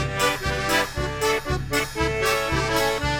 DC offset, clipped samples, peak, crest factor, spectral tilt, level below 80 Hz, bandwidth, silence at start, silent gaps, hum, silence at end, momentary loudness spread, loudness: under 0.1%; under 0.1%; -6 dBFS; 16 dB; -3.5 dB/octave; -36 dBFS; 17 kHz; 0 s; none; none; 0 s; 3 LU; -23 LUFS